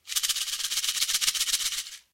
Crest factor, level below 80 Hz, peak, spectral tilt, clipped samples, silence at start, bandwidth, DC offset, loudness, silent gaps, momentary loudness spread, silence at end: 24 dB; -62 dBFS; -6 dBFS; 4.5 dB/octave; under 0.1%; 0.05 s; 17 kHz; under 0.1%; -25 LUFS; none; 4 LU; 0.15 s